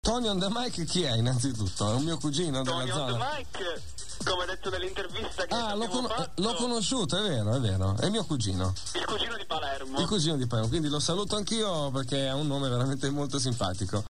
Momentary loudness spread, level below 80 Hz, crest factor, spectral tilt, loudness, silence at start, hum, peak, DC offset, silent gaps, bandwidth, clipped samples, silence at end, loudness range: 5 LU; -48 dBFS; 16 dB; -4.5 dB/octave; -30 LUFS; 0 s; none; -14 dBFS; 1%; none; 13 kHz; under 0.1%; 0 s; 3 LU